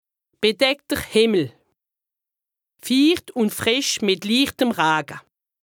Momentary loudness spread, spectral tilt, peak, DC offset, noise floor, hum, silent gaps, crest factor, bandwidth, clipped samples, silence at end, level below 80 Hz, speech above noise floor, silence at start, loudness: 7 LU; -3.5 dB/octave; -4 dBFS; under 0.1%; -87 dBFS; none; none; 18 dB; over 20 kHz; under 0.1%; 0.45 s; -56 dBFS; 67 dB; 0.4 s; -20 LUFS